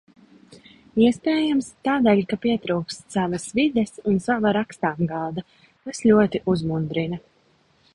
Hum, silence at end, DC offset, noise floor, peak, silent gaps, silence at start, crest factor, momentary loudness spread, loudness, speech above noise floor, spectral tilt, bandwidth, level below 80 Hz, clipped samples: none; 0.75 s; under 0.1%; -61 dBFS; -4 dBFS; none; 0.5 s; 18 dB; 10 LU; -22 LUFS; 40 dB; -6 dB/octave; 11.5 kHz; -54 dBFS; under 0.1%